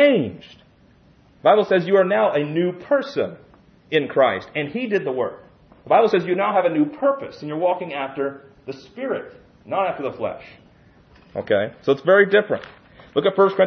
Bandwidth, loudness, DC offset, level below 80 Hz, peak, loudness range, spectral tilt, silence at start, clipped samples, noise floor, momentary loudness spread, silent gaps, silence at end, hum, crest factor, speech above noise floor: 6.4 kHz; -20 LUFS; under 0.1%; -62 dBFS; -2 dBFS; 7 LU; -7.5 dB/octave; 0 s; under 0.1%; -53 dBFS; 13 LU; none; 0 s; none; 18 dB; 33 dB